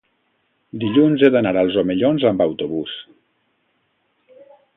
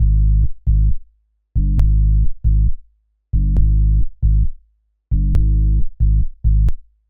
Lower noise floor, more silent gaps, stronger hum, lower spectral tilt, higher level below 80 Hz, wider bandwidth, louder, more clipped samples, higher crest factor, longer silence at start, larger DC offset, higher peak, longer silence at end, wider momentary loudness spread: first, -67 dBFS vs -59 dBFS; neither; neither; second, -9.5 dB/octave vs -14.5 dB/octave; second, -56 dBFS vs -16 dBFS; first, 4 kHz vs 0.8 kHz; about the same, -17 LUFS vs -19 LUFS; neither; first, 20 dB vs 12 dB; first, 0.75 s vs 0 s; neither; about the same, 0 dBFS vs -2 dBFS; first, 1.75 s vs 0.3 s; first, 14 LU vs 7 LU